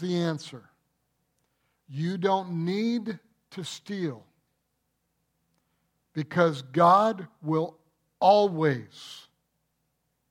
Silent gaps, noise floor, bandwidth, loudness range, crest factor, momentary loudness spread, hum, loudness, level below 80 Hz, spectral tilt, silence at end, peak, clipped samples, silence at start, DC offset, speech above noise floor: none; -77 dBFS; 12.5 kHz; 11 LU; 22 dB; 22 LU; none; -26 LUFS; -78 dBFS; -6.5 dB/octave; 1.1 s; -8 dBFS; under 0.1%; 0 s; under 0.1%; 51 dB